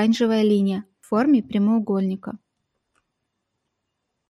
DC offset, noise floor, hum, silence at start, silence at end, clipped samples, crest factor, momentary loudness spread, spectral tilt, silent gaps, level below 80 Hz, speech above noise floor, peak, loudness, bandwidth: under 0.1%; -78 dBFS; none; 0 s; 1.95 s; under 0.1%; 14 dB; 13 LU; -7 dB/octave; none; -66 dBFS; 58 dB; -8 dBFS; -21 LUFS; 11.5 kHz